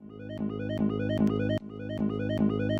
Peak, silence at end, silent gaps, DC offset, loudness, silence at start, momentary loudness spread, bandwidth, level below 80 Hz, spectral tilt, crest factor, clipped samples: -14 dBFS; 0 s; none; under 0.1%; -30 LUFS; 0 s; 8 LU; 6.8 kHz; -50 dBFS; -8.5 dB/octave; 16 dB; under 0.1%